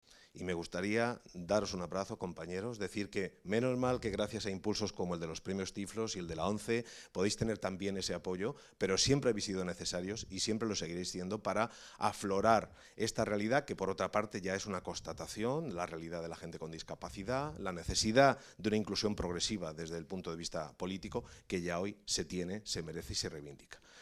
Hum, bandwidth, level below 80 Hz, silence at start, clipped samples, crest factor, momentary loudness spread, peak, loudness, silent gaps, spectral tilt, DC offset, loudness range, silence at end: none; 15 kHz; -58 dBFS; 0.1 s; under 0.1%; 24 dB; 11 LU; -12 dBFS; -37 LUFS; none; -4 dB/octave; under 0.1%; 5 LU; 0 s